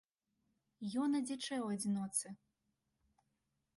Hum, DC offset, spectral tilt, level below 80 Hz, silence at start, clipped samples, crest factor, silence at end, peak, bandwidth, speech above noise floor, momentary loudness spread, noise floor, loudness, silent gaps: none; under 0.1%; -4 dB/octave; -82 dBFS; 0.8 s; under 0.1%; 20 dB; 1.4 s; -22 dBFS; 11.5 kHz; 46 dB; 12 LU; -85 dBFS; -39 LUFS; none